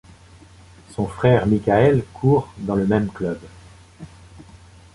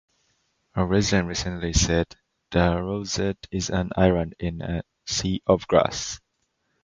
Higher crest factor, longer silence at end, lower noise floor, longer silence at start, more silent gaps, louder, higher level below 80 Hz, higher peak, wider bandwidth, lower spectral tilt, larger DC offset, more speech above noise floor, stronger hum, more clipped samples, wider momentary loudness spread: about the same, 20 dB vs 22 dB; second, 0.4 s vs 0.65 s; second, -46 dBFS vs -74 dBFS; first, 0.9 s vs 0.75 s; neither; first, -19 LUFS vs -24 LUFS; second, -44 dBFS vs -38 dBFS; about the same, -2 dBFS vs -2 dBFS; first, 11.5 kHz vs 9.4 kHz; first, -8.5 dB/octave vs -4.5 dB/octave; neither; second, 28 dB vs 50 dB; neither; neither; first, 13 LU vs 10 LU